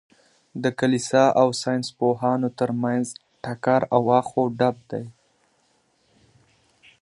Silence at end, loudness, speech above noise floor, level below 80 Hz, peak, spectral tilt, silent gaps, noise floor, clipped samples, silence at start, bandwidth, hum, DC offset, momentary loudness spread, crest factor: 1.9 s; -22 LUFS; 44 dB; -66 dBFS; -4 dBFS; -5.5 dB/octave; none; -65 dBFS; under 0.1%; 0.55 s; 11.5 kHz; none; under 0.1%; 15 LU; 20 dB